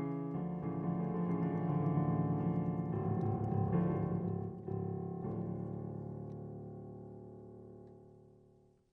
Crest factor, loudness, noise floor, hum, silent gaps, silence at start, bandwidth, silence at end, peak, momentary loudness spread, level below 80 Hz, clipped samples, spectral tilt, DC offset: 16 dB; -38 LUFS; -67 dBFS; none; none; 0 s; 3 kHz; 0.65 s; -22 dBFS; 18 LU; -62 dBFS; under 0.1%; -12 dB/octave; under 0.1%